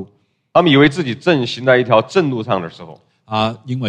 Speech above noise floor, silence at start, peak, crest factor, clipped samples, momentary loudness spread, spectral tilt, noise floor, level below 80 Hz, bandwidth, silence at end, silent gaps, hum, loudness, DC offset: 36 dB; 0 s; 0 dBFS; 16 dB; under 0.1%; 10 LU; -6.5 dB/octave; -51 dBFS; -54 dBFS; 9.8 kHz; 0 s; none; none; -15 LUFS; under 0.1%